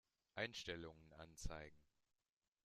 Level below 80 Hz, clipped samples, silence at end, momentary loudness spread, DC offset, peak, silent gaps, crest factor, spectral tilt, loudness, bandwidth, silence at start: -62 dBFS; under 0.1%; 0.8 s; 14 LU; under 0.1%; -30 dBFS; none; 24 dB; -3.5 dB/octave; -52 LUFS; 13.5 kHz; 0.35 s